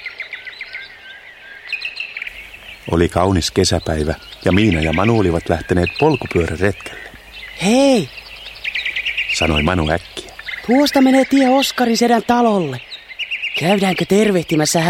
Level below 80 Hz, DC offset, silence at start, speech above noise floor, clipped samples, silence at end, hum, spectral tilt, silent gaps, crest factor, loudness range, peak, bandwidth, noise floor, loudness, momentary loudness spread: -36 dBFS; under 0.1%; 0 s; 23 dB; under 0.1%; 0 s; none; -5 dB/octave; none; 16 dB; 5 LU; 0 dBFS; 16.5 kHz; -38 dBFS; -16 LUFS; 19 LU